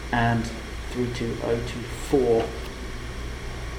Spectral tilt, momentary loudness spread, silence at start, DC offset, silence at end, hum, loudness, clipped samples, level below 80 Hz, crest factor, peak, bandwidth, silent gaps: -6 dB/octave; 13 LU; 0 s; under 0.1%; 0 s; none; -27 LUFS; under 0.1%; -36 dBFS; 18 dB; -8 dBFS; 18.5 kHz; none